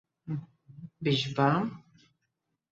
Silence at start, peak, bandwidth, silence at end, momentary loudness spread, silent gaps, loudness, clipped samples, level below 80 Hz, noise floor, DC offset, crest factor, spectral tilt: 0.25 s; -12 dBFS; 7.8 kHz; 0.9 s; 23 LU; none; -30 LUFS; under 0.1%; -68 dBFS; -82 dBFS; under 0.1%; 20 dB; -6.5 dB/octave